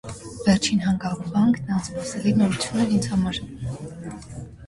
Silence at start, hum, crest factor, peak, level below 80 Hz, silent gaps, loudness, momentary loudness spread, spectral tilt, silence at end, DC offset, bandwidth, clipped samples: 0.05 s; none; 18 dB; -6 dBFS; -46 dBFS; none; -23 LUFS; 16 LU; -5.5 dB/octave; 0 s; under 0.1%; 11.5 kHz; under 0.1%